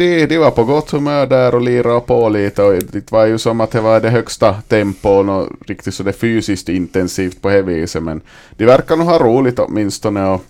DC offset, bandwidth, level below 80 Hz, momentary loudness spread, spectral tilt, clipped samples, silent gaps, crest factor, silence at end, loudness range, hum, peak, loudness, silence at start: under 0.1%; 15.5 kHz; -40 dBFS; 8 LU; -6.5 dB/octave; under 0.1%; none; 14 dB; 0.05 s; 3 LU; none; 0 dBFS; -14 LUFS; 0 s